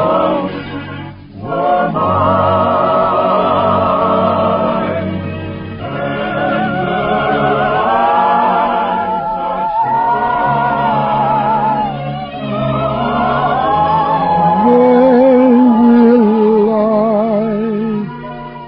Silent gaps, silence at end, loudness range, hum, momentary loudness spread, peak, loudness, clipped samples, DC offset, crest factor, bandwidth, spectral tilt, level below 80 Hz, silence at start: none; 0 s; 6 LU; none; 13 LU; 0 dBFS; -13 LUFS; under 0.1%; under 0.1%; 12 dB; 5.4 kHz; -12.5 dB/octave; -40 dBFS; 0 s